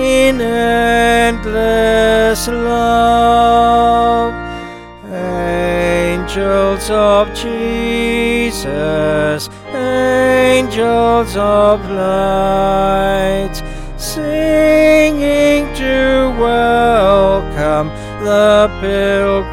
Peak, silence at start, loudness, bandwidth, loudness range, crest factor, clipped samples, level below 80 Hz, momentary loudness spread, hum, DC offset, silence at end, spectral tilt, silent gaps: 0 dBFS; 0 s; -13 LUFS; 17 kHz; 4 LU; 12 dB; under 0.1%; -28 dBFS; 10 LU; none; under 0.1%; 0 s; -5 dB/octave; none